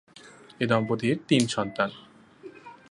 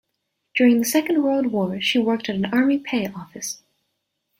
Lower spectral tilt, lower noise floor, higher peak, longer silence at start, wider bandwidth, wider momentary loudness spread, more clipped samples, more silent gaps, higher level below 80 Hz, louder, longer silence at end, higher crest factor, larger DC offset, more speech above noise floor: about the same, -5 dB/octave vs -4 dB/octave; second, -50 dBFS vs -76 dBFS; about the same, -8 dBFS vs -6 dBFS; second, 0.25 s vs 0.55 s; second, 11.5 kHz vs 16.5 kHz; first, 22 LU vs 13 LU; neither; neither; about the same, -64 dBFS vs -64 dBFS; second, -26 LUFS vs -21 LUFS; second, 0.2 s vs 0.85 s; about the same, 20 dB vs 16 dB; neither; second, 25 dB vs 56 dB